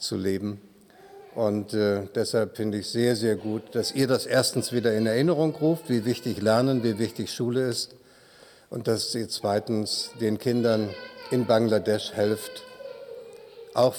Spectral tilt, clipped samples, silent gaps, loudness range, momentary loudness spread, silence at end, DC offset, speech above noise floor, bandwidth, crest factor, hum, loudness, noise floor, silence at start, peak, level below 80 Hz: -5 dB/octave; under 0.1%; none; 4 LU; 16 LU; 0 s; under 0.1%; 28 dB; 19.5 kHz; 18 dB; none; -26 LUFS; -53 dBFS; 0 s; -8 dBFS; -70 dBFS